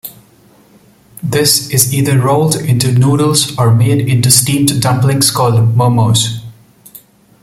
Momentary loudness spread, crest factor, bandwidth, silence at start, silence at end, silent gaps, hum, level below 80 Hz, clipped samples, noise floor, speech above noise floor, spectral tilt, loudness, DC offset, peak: 5 LU; 12 dB; over 20 kHz; 0.05 s; 0.9 s; none; none; -44 dBFS; under 0.1%; -45 dBFS; 35 dB; -4.5 dB/octave; -11 LUFS; under 0.1%; 0 dBFS